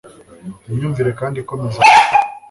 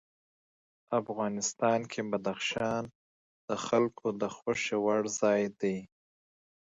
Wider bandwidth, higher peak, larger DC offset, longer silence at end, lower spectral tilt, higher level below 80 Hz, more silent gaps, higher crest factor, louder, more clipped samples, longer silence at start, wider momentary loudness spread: first, 11.5 kHz vs 8 kHz; first, 0 dBFS vs -14 dBFS; neither; second, 0.1 s vs 0.9 s; about the same, -4.5 dB/octave vs -4 dB/octave; first, -50 dBFS vs -72 dBFS; second, none vs 2.95-3.48 s; about the same, 16 dB vs 20 dB; first, -14 LUFS vs -32 LUFS; neither; second, 0.05 s vs 0.9 s; first, 18 LU vs 8 LU